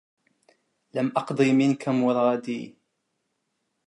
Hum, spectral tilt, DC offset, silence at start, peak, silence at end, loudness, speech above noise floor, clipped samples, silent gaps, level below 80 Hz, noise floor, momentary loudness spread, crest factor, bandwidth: none; -7 dB/octave; under 0.1%; 0.95 s; -8 dBFS; 1.2 s; -24 LUFS; 54 dB; under 0.1%; none; -80 dBFS; -77 dBFS; 14 LU; 20 dB; 11 kHz